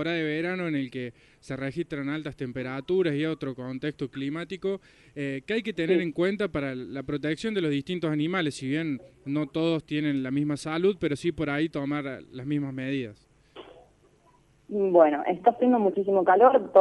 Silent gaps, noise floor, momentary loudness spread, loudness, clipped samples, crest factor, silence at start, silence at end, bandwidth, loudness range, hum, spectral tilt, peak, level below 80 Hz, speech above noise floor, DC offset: none; -61 dBFS; 12 LU; -27 LUFS; under 0.1%; 22 dB; 0 s; 0 s; 11.5 kHz; 5 LU; none; -7 dB/octave; -6 dBFS; -60 dBFS; 35 dB; under 0.1%